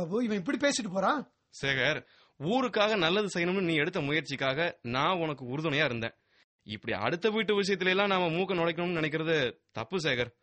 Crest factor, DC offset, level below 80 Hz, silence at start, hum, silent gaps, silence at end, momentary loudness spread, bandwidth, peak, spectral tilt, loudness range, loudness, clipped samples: 18 dB; under 0.1%; -64 dBFS; 0 s; none; 6.44-6.59 s; 0.1 s; 8 LU; 8.4 kHz; -12 dBFS; -4.5 dB/octave; 2 LU; -29 LUFS; under 0.1%